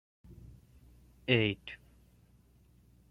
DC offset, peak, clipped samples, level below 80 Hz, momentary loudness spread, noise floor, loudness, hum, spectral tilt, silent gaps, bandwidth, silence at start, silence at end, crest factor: under 0.1%; -12 dBFS; under 0.1%; -62 dBFS; 27 LU; -64 dBFS; -32 LUFS; 60 Hz at -55 dBFS; -7.5 dB/octave; none; 6 kHz; 0.3 s; 1.35 s; 26 dB